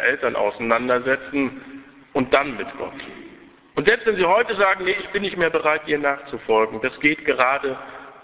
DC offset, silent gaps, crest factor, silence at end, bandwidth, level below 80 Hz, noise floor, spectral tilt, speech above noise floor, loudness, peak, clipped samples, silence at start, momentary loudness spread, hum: under 0.1%; none; 22 dB; 0.1 s; 4 kHz; -56 dBFS; -47 dBFS; -8 dB/octave; 26 dB; -21 LUFS; 0 dBFS; under 0.1%; 0 s; 14 LU; none